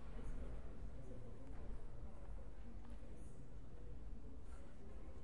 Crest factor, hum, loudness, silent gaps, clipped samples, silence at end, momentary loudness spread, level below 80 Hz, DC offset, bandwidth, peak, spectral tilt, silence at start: 16 dB; none; -57 LUFS; none; under 0.1%; 0 s; 5 LU; -54 dBFS; 0.4%; 11 kHz; -36 dBFS; -7.5 dB/octave; 0 s